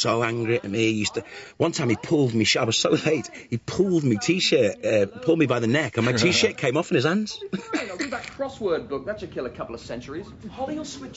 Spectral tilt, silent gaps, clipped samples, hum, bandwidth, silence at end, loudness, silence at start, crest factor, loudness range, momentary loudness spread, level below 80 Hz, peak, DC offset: -4.5 dB/octave; none; under 0.1%; none; 8 kHz; 0 s; -24 LUFS; 0 s; 18 dB; 9 LU; 13 LU; -56 dBFS; -6 dBFS; under 0.1%